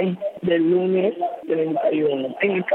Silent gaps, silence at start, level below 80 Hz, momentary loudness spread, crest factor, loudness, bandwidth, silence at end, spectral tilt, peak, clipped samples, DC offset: none; 0 s; -68 dBFS; 6 LU; 12 dB; -21 LUFS; 4.1 kHz; 0 s; -9 dB/octave; -8 dBFS; under 0.1%; under 0.1%